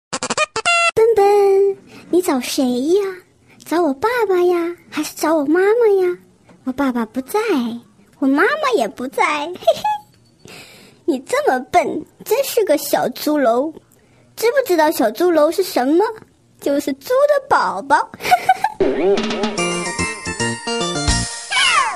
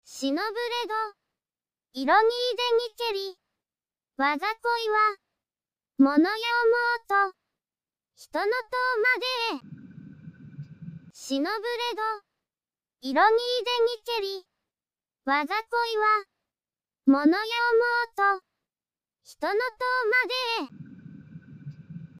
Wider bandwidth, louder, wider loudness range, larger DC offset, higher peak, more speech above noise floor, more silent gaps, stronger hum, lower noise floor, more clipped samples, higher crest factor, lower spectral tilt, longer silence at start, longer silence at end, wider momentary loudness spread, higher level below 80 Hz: second, 14 kHz vs 15.5 kHz; first, -17 LUFS vs -25 LUFS; about the same, 3 LU vs 4 LU; neither; first, 0 dBFS vs -10 dBFS; second, 35 dB vs over 65 dB; neither; neither; second, -51 dBFS vs under -90 dBFS; neither; about the same, 18 dB vs 18 dB; about the same, -3.5 dB/octave vs -4 dB/octave; about the same, 0.1 s vs 0.1 s; about the same, 0 s vs 0 s; second, 9 LU vs 22 LU; first, -42 dBFS vs -74 dBFS